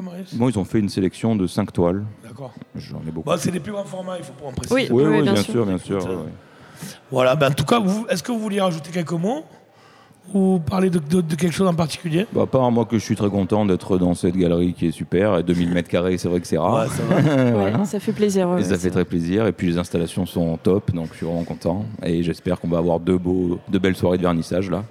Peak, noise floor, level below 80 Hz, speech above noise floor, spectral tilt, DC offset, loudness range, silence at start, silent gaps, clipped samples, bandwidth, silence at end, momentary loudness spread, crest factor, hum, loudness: -4 dBFS; -50 dBFS; -48 dBFS; 30 dB; -6.5 dB/octave; under 0.1%; 4 LU; 0 s; none; under 0.1%; 15.5 kHz; 0 s; 11 LU; 18 dB; none; -21 LUFS